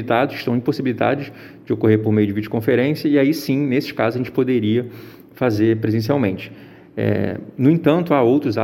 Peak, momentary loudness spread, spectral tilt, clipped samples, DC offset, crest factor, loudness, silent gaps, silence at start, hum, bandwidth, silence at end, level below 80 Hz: -2 dBFS; 10 LU; -8 dB/octave; under 0.1%; under 0.1%; 16 dB; -19 LUFS; none; 0 s; none; 16.5 kHz; 0 s; -58 dBFS